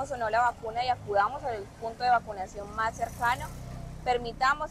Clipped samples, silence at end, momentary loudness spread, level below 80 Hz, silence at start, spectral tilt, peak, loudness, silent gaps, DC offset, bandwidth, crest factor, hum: under 0.1%; 0 s; 11 LU; -48 dBFS; 0 s; -4 dB/octave; -14 dBFS; -30 LUFS; none; under 0.1%; 15 kHz; 14 dB; none